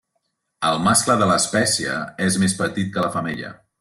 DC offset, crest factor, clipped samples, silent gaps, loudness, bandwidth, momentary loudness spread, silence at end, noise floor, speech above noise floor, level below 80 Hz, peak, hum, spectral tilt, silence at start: under 0.1%; 18 dB; under 0.1%; none; -19 LUFS; 12.5 kHz; 10 LU; 0.25 s; -73 dBFS; 53 dB; -56 dBFS; -4 dBFS; none; -3.5 dB/octave; 0.6 s